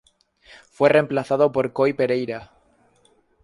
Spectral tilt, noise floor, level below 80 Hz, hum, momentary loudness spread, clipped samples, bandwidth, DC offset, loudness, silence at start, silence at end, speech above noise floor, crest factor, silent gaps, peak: -7 dB/octave; -61 dBFS; -62 dBFS; none; 9 LU; under 0.1%; 11.5 kHz; under 0.1%; -20 LUFS; 0.8 s; 1 s; 41 dB; 20 dB; none; -2 dBFS